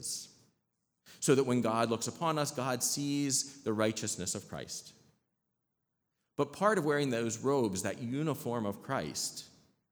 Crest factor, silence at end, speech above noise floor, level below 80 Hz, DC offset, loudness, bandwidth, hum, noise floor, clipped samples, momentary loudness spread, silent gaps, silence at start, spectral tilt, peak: 20 dB; 0.45 s; 52 dB; -74 dBFS; under 0.1%; -33 LUFS; over 20 kHz; none; -85 dBFS; under 0.1%; 11 LU; none; 0 s; -4 dB/octave; -14 dBFS